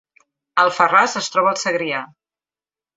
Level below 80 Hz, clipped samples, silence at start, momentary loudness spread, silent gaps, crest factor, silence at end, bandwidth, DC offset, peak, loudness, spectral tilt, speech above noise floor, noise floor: -70 dBFS; under 0.1%; 0.55 s; 10 LU; none; 18 dB; 0.9 s; 8 kHz; under 0.1%; -2 dBFS; -17 LUFS; -2.5 dB/octave; over 72 dB; under -90 dBFS